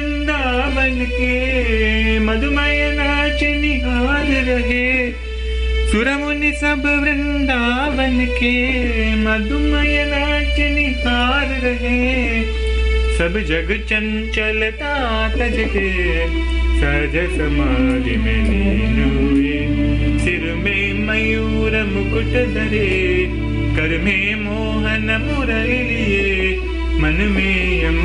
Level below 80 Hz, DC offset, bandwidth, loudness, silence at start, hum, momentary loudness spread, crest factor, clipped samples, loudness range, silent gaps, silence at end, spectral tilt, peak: -22 dBFS; under 0.1%; 10.5 kHz; -17 LUFS; 0 s; none; 3 LU; 12 dB; under 0.1%; 2 LU; none; 0 s; -6 dB/octave; -4 dBFS